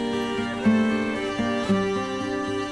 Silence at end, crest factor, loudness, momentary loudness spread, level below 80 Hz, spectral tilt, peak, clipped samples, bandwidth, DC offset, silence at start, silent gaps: 0 s; 14 dB; -25 LUFS; 6 LU; -52 dBFS; -5.5 dB/octave; -10 dBFS; under 0.1%; 11.5 kHz; under 0.1%; 0 s; none